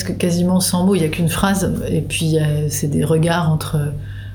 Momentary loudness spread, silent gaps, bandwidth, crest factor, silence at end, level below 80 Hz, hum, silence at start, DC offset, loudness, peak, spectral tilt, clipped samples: 5 LU; none; over 20 kHz; 14 dB; 0 s; -36 dBFS; none; 0 s; under 0.1%; -17 LUFS; -2 dBFS; -5.5 dB/octave; under 0.1%